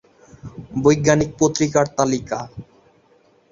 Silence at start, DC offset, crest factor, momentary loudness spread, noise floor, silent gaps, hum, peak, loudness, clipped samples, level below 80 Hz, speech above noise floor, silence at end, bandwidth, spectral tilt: 0.45 s; under 0.1%; 20 dB; 21 LU; -56 dBFS; none; none; -2 dBFS; -19 LUFS; under 0.1%; -48 dBFS; 38 dB; 0.9 s; 7.8 kHz; -5 dB/octave